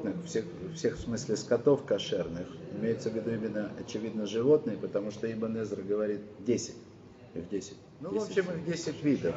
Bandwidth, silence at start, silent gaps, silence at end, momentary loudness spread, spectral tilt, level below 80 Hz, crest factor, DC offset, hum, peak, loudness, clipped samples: 8 kHz; 0 s; none; 0 s; 14 LU; -6 dB/octave; -62 dBFS; 20 dB; under 0.1%; none; -12 dBFS; -32 LUFS; under 0.1%